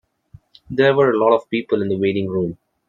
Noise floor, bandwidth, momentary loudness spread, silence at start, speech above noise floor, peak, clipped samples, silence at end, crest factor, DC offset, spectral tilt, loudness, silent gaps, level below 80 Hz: -49 dBFS; 7 kHz; 9 LU; 0.7 s; 31 dB; -2 dBFS; under 0.1%; 0.35 s; 16 dB; under 0.1%; -8.5 dB/octave; -18 LUFS; none; -58 dBFS